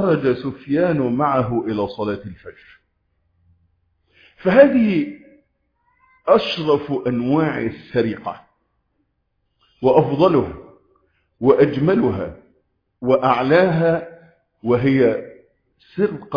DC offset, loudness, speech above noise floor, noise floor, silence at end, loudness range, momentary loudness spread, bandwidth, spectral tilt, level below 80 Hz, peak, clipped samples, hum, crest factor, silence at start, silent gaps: under 0.1%; -18 LUFS; 53 dB; -70 dBFS; 0 s; 5 LU; 15 LU; 5.2 kHz; -9 dB/octave; -52 dBFS; 0 dBFS; under 0.1%; none; 18 dB; 0 s; none